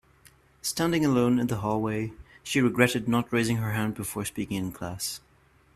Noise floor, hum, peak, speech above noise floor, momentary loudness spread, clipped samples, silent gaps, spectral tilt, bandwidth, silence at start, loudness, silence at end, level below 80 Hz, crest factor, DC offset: -61 dBFS; none; -4 dBFS; 34 dB; 11 LU; under 0.1%; none; -5 dB/octave; 15 kHz; 0.65 s; -27 LUFS; 0.55 s; -56 dBFS; 24 dB; under 0.1%